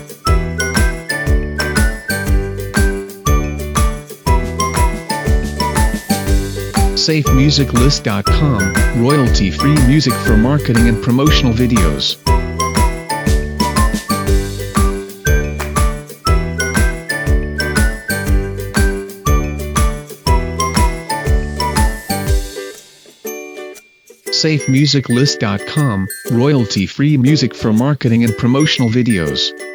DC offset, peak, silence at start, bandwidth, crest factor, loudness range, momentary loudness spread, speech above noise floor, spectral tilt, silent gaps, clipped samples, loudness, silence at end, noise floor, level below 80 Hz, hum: under 0.1%; 0 dBFS; 0 s; over 20 kHz; 14 dB; 5 LU; 7 LU; 31 dB; -5 dB/octave; none; under 0.1%; -15 LUFS; 0 s; -43 dBFS; -20 dBFS; none